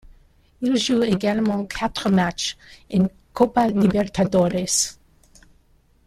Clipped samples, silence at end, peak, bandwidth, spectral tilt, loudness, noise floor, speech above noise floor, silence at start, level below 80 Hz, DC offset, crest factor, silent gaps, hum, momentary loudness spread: under 0.1%; 1.15 s; -4 dBFS; 14.5 kHz; -4.5 dB/octave; -21 LUFS; -58 dBFS; 37 dB; 0.6 s; -48 dBFS; under 0.1%; 18 dB; none; none; 7 LU